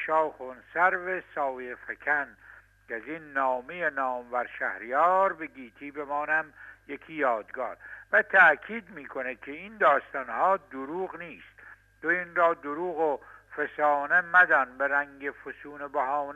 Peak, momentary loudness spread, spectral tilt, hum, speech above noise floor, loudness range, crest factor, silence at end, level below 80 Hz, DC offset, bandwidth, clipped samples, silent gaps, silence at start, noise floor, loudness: -8 dBFS; 18 LU; -5.5 dB/octave; none; 25 dB; 6 LU; 20 dB; 0 s; -68 dBFS; under 0.1%; 10 kHz; under 0.1%; none; 0 s; -53 dBFS; -27 LUFS